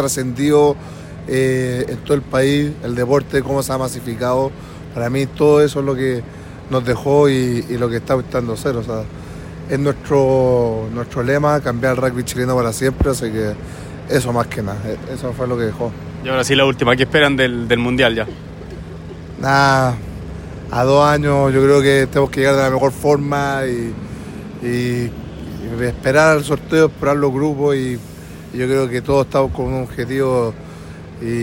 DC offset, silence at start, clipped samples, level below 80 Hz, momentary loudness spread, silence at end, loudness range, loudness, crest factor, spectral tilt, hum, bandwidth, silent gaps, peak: under 0.1%; 0 s; under 0.1%; -38 dBFS; 17 LU; 0 s; 5 LU; -17 LUFS; 16 dB; -5.5 dB/octave; none; 16.5 kHz; none; 0 dBFS